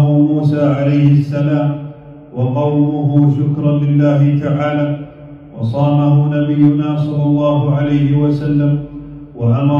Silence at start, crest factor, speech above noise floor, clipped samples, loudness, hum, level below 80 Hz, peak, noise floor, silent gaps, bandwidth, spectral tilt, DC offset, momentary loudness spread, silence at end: 0 s; 12 dB; 22 dB; under 0.1%; -14 LUFS; none; -44 dBFS; -2 dBFS; -34 dBFS; none; 4.6 kHz; -10.5 dB/octave; under 0.1%; 11 LU; 0 s